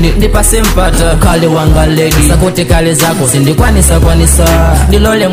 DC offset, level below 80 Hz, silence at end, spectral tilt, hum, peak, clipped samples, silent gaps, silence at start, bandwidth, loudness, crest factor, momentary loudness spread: 0.6%; -10 dBFS; 0 s; -5 dB/octave; none; 0 dBFS; 0.9%; none; 0 s; 16.5 kHz; -8 LUFS; 6 dB; 2 LU